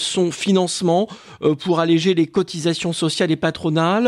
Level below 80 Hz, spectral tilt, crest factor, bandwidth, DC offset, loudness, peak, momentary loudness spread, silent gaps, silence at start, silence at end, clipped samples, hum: -58 dBFS; -5 dB/octave; 14 dB; 12 kHz; under 0.1%; -19 LUFS; -4 dBFS; 5 LU; none; 0 s; 0 s; under 0.1%; none